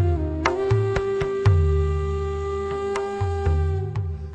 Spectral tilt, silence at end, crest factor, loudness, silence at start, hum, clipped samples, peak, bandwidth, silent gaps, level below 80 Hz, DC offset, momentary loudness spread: -7.5 dB/octave; 0 s; 18 dB; -24 LUFS; 0 s; none; under 0.1%; -4 dBFS; 8.6 kHz; none; -30 dBFS; under 0.1%; 7 LU